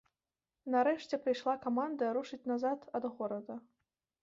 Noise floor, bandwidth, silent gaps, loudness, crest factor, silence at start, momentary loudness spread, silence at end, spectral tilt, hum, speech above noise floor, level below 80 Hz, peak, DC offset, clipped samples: under -90 dBFS; 7.6 kHz; none; -36 LUFS; 18 dB; 0.65 s; 11 LU; 0.6 s; -3.5 dB/octave; none; over 55 dB; -82 dBFS; -20 dBFS; under 0.1%; under 0.1%